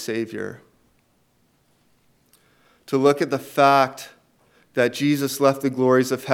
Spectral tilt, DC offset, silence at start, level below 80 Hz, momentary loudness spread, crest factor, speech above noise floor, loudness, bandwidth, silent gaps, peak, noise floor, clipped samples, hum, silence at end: -5 dB/octave; under 0.1%; 0 s; -74 dBFS; 15 LU; 20 dB; 44 dB; -20 LUFS; 17 kHz; none; -2 dBFS; -64 dBFS; under 0.1%; none; 0 s